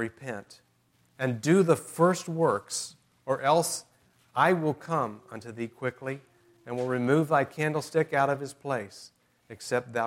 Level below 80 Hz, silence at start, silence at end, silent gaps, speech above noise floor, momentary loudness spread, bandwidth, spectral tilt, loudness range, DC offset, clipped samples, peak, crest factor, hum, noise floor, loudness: -74 dBFS; 0 s; 0 s; none; 39 dB; 16 LU; 16 kHz; -5.5 dB/octave; 3 LU; under 0.1%; under 0.1%; -8 dBFS; 20 dB; none; -67 dBFS; -28 LUFS